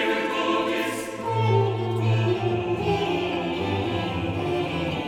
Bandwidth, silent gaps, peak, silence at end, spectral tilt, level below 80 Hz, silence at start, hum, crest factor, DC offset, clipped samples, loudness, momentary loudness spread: 15 kHz; none; -10 dBFS; 0 s; -6.5 dB/octave; -50 dBFS; 0 s; none; 14 dB; under 0.1%; under 0.1%; -25 LUFS; 4 LU